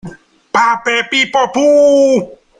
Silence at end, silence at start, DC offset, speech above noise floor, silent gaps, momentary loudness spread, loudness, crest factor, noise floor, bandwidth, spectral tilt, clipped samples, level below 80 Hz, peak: 0.3 s; 0.05 s; under 0.1%; 23 dB; none; 6 LU; -11 LUFS; 12 dB; -33 dBFS; 9.8 kHz; -3.5 dB/octave; under 0.1%; -54 dBFS; 0 dBFS